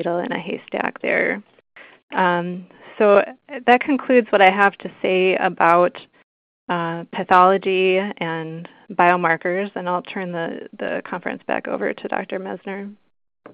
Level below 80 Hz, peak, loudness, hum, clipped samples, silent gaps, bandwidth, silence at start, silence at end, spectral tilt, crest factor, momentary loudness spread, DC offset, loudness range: -68 dBFS; 0 dBFS; -19 LUFS; none; under 0.1%; 2.03-2.08 s, 6.23-6.67 s; 5.8 kHz; 0 s; 0.6 s; -7.5 dB/octave; 20 dB; 14 LU; under 0.1%; 8 LU